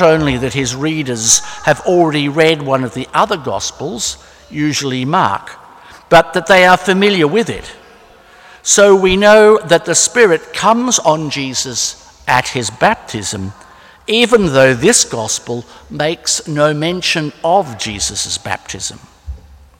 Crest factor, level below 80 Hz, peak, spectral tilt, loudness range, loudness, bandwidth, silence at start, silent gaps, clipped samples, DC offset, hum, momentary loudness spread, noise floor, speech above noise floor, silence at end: 14 dB; -40 dBFS; 0 dBFS; -3 dB/octave; 6 LU; -13 LUFS; 17 kHz; 0 s; none; under 0.1%; under 0.1%; none; 13 LU; -42 dBFS; 29 dB; 0.45 s